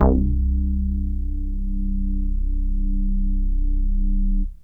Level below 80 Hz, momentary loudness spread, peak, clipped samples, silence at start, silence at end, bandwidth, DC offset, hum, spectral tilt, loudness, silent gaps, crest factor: -20 dBFS; 6 LU; -4 dBFS; under 0.1%; 0 s; 0.1 s; 1.6 kHz; 0.4%; 50 Hz at -65 dBFS; -12.5 dB/octave; -25 LUFS; none; 16 dB